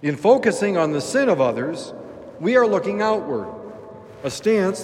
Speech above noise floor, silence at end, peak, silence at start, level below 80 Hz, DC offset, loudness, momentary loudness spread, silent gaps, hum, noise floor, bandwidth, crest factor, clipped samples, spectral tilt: 20 dB; 0 s; -2 dBFS; 0 s; -64 dBFS; under 0.1%; -20 LUFS; 20 LU; none; none; -39 dBFS; 14 kHz; 18 dB; under 0.1%; -5.5 dB/octave